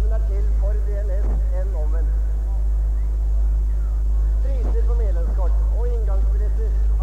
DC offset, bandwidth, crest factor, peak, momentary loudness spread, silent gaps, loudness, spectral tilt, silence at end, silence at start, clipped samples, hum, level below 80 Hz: 1%; 2 kHz; 6 dB; -10 dBFS; 2 LU; none; -23 LUFS; -9 dB/octave; 0 s; 0 s; under 0.1%; 50 Hz at -35 dBFS; -18 dBFS